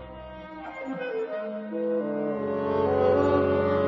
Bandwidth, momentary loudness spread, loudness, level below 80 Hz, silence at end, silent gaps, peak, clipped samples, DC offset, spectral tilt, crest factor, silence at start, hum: 7.2 kHz; 17 LU; -27 LUFS; -56 dBFS; 0 s; none; -10 dBFS; under 0.1%; under 0.1%; -8.5 dB/octave; 16 dB; 0 s; none